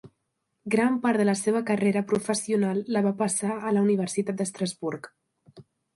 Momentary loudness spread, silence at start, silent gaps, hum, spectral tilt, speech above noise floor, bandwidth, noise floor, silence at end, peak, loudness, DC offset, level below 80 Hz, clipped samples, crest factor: 7 LU; 0.05 s; none; none; -5.5 dB/octave; 53 dB; 11.5 kHz; -78 dBFS; 0.35 s; -10 dBFS; -26 LUFS; under 0.1%; -70 dBFS; under 0.1%; 16 dB